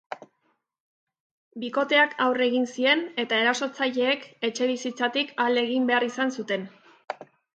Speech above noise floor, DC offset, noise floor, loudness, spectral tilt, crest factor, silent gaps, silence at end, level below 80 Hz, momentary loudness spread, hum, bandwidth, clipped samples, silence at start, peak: 48 dB; under 0.1%; -73 dBFS; -24 LUFS; -3 dB/octave; 20 dB; 0.80-1.07 s, 1.20-1.51 s; 0.3 s; -80 dBFS; 17 LU; none; 8.8 kHz; under 0.1%; 0.1 s; -8 dBFS